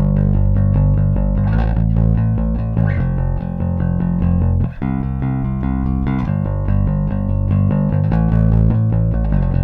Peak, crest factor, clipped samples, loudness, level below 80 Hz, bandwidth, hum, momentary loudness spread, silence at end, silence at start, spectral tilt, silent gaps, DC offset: -6 dBFS; 10 dB; under 0.1%; -17 LUFS; -20 dBFS; 3.8 kHz; none; 5 LU; 0 s; 0 s; -12 dB/octave; none; under 0.1%